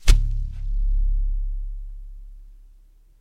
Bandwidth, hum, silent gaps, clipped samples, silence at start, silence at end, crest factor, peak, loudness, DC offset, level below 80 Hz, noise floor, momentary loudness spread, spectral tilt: 11.5 kHz; none; none; under 0.1%; 0 s; 0.65 s; 22 dB; 0 dBFS; -28 LUFS; under 0.1%; -22 dBFS; -51 dBFS; 22 LU; -4 dB/octave